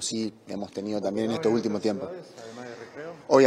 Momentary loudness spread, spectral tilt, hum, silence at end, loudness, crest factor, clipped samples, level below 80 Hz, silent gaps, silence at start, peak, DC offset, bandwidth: 15 LU; -5 dB/octave; none; 0 s; -29 LUFS; 20 dB; under 0.1%; -72 dBFS; none; 0 s; -6 dBFS; under 0.1%; 12.5 kHz